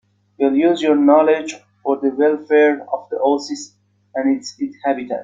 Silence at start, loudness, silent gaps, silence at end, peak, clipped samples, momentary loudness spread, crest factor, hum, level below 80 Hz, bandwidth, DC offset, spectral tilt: 0.4 s; -17 LUFS; none; 0 s; -2 dBFS; under 0.1%; 15 LU; 16 dB; none; -66 dBFS; 7.8 kHz; under 0.1%; -4.5 dB/octave